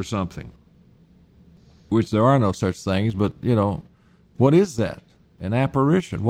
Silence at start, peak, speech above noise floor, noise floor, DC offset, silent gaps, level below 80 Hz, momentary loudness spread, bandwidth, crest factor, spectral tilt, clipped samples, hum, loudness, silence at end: 0 s; -4 dBFS; 35 dB; -55 dBFS; under 0.1%; none; -50 dBFS; 13 LU; 13 kHz; 18 dB; -7.5 dB/octave; under 0.1%; none; -21 LUFS; 0 s